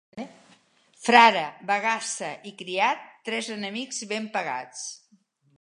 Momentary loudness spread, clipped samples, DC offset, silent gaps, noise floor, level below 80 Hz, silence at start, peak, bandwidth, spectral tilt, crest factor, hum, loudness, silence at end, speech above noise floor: 20 LU; under 0.1%; under 0.1%; none; -64 dBFS; -78 dBFS; 0.15 s; -2 dBFS; 11.5 kHz; -2 dB/octave; 26 dB; none; -24 LUFS; 0.65 s; 39 dB